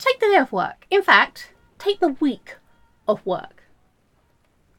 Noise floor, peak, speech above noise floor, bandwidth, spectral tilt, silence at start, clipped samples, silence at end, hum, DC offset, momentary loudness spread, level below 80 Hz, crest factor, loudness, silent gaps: -62 dBFS; 0 dBFS; 42 dB; 16.5 kHz; -4.5 dB/octave; 0 s; under 0.1%; 1.3 s; none; under 0.1%; 14 LU; -62 dBFS; 22 dB; -20 LUFS; none